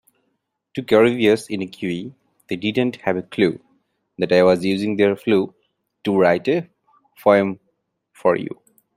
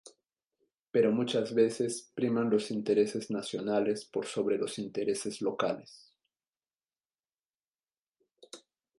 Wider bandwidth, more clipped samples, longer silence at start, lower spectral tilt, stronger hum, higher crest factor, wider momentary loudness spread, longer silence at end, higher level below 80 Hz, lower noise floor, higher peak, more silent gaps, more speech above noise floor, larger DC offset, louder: first, 15.5 kHz vs 11.5 kHz; neither; first, 0.75 s vs 0.05 s; first, -6.5 dB/octave vs -5 dB/octave; neither; about the same, 18 dB vs 20 dB; first, 15 LU vs 8 LU; about the same, 0.5 s vs 0.4 s; first, -62 dBFS vs -78 dBFS; second, -73 dBFS vs under -90 dBFS; first, -2 dBFS vs -14 dBFS; second, none vs 0.46-0.50 s, 0.82-0.86 s, 6.49-6.53 s, 7.06-7.10 s, 7.40-7.67 s, 7.83-7.87 s, 7.99-8.12 s; second, 54 dB vs over 59 dB; neither; first, -19 LUFS vs -31 LUFS